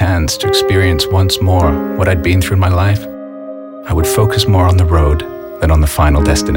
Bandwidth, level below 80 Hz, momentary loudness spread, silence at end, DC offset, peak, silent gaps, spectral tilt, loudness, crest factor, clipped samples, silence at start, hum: 17 kHz; -20 dBFS; 14 LU; 0 s; under 0.1%; 0 dBFS; none; -5.5 dB/octave; -12 LUFS; 12 dB; under 0.1%; 0 s; none